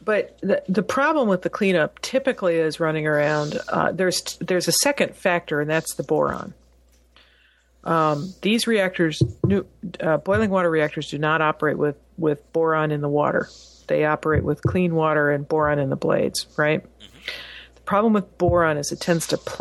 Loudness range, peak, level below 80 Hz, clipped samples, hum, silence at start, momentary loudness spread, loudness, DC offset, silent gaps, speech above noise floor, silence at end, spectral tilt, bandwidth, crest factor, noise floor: 2 LU; -6 dBFS; -48 dBFS; under 0.1%; none; 0.05 s; 7 LU; -22 LUFS; under 0.1%; none; 37 dB; 0 s; -5 dB/octave; 13 kHz; 16 dB; -58 dBFS